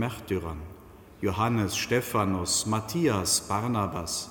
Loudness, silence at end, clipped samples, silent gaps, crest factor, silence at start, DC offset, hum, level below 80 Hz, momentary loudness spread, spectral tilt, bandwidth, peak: -27 LUFS; 0 s; under 0.1%; none; 16 dB; 0 s; under 0.1%; none; -50 dBFS; 8 LU; -4 dB/octave; 17.5 kHz; -12 dBFS